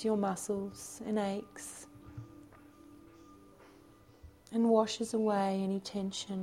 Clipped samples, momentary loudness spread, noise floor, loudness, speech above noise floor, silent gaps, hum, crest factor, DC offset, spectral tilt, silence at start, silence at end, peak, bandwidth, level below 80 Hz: under 0.1%; 22 LU; -59 dBFS; -34 LUFS; 26 dB; none; none; 20 dB; under 0.1%; -5.5 dB/octave; 0 s; 0 s; -14 dBFS; 15.5 kHz; -68 dBFS